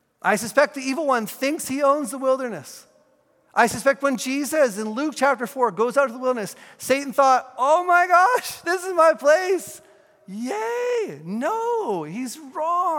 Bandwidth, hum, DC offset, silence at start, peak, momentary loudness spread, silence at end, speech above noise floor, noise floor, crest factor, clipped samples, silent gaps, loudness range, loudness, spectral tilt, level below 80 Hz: 17.5 kHz; none; under 0.1%; 0.25 s; -2 dBFS; 12 LU; 0 s; 40 dB; -61 dBFS; 20 dB; under 0.1%; none; 5 LU; -21 LUFS; -3.5 dB/octave; -70 dBFS